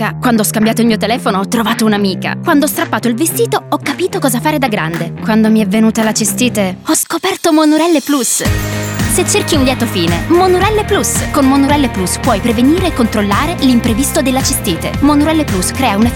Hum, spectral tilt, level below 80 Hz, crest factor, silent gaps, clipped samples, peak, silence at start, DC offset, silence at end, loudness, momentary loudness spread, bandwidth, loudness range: none; -4.5 dB/octave; -30 dBFS; 10 dB; none; under 0.1%; 0 dBFS; 0 s; under 0.1%; 0 s; -12 LUFS; 5 LU; 20 kHz; 2 LU